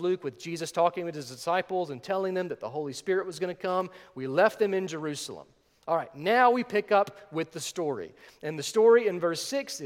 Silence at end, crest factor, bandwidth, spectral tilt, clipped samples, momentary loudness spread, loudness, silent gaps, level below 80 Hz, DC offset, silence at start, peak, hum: 0 s; 20 dB; 16 kHz; -4.5 dB/octave; under 0.1%; 14 LU; -28 LUFS; none; -74 dBFS; under 0.1%; 0 s; -8 dBFS; none